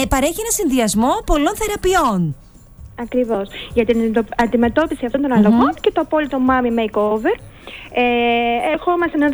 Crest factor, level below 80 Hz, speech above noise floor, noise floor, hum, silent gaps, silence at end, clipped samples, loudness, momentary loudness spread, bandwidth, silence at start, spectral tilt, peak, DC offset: 14 dB; -34 dBFS; 23 dB; -40 dBFS; none; none; 0 s; under 0.1%; -17 LUFS; 7 LU; over 20 kHz; 0 s; -4.5 dB/octave; -2 dBFS; under 0.1%